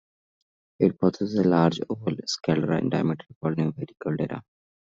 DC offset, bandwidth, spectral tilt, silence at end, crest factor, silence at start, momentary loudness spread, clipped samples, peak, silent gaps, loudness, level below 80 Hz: under 0.1%; 7.8 kHz; -6.5 dB/octave; 0.4 s; 20 dB; 0.8 s; 9 LU; under 0.1%; -6 dBFS; 3.36-3.41 s; -26 LUFS; -62 dBFS